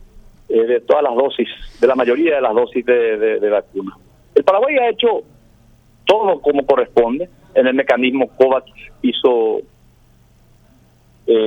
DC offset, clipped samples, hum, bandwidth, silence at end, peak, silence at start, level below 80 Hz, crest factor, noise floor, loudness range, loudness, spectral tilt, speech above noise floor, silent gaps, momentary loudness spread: under 0.1%; under 0.1%; none; 7 kHz; 0 s; 0 dBFS; 0.15 s; -48 dBFS; 16 dB; -51 dBFS; 2 LU; -16 LUFS; -5.5 dB/octave; 35 dB; none; 8 LU